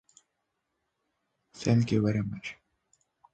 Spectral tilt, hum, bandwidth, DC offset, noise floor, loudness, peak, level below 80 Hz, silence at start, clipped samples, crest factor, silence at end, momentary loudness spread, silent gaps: -7 dB/octave; none; 8.8 kHz; under 0.1%; -81 dBFS; -29 LUFS; -12 dBFS; -60 dBFS; 1.55 s; under 0.1%; 20 dB; 0.8 s; 15 LU; none